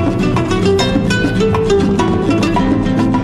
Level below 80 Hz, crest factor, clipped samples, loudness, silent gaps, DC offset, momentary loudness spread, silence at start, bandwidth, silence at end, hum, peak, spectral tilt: -28 dBFS; 12 dB; under 0.1%; -14 LUFS; none; under 0.1%; 2 LU; 0 s; 12.5 kHz; 0 s; none; 0 dBFS; -6.5 dB/octave